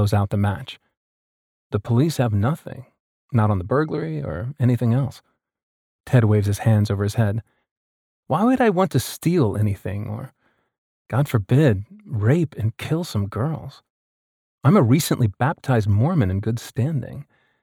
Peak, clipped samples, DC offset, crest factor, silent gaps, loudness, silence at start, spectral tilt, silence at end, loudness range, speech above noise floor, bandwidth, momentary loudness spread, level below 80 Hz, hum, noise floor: -4 dBFS; under 0.1%; under 0.1%; 18 dB; 0.97-1.70 s, 3.00-3.29 s, 5.63-5.99 s, 7.71-8.23 s, 10.78-11.05 s, 13.90-14.58 s; -21 LUFS; 0 s; -7 dB/octave; 0.4 s; 3 LU; over 70 dB; 16.5 kHz; 12 LU; -52 dBFS; none; under -90 dBFS